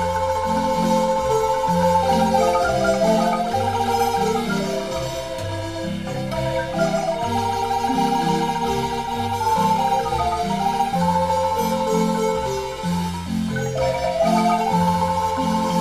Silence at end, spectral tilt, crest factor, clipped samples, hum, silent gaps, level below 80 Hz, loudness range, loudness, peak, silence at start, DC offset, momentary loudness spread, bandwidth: 0 s; -5.5 dB/octave; 14 dB; under 0.1%; none; none; -42 dBFS; 4 LU; -21 LUFS; -6 dBFS; 0 s; under 0.1%; 7 LU; 15.5 kHz